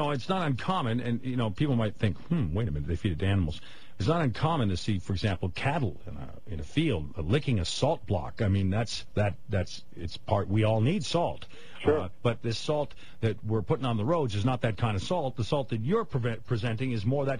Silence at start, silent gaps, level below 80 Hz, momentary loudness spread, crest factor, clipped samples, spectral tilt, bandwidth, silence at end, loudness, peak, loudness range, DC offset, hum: 0 s; none; -48 dBFS; 6 LU; 18 dB; under 0.1%; -6.5 dB/octave; 10.5 kHz; 0 s; -30 LUFS; -10 dBFS; 1 LU; 1%; none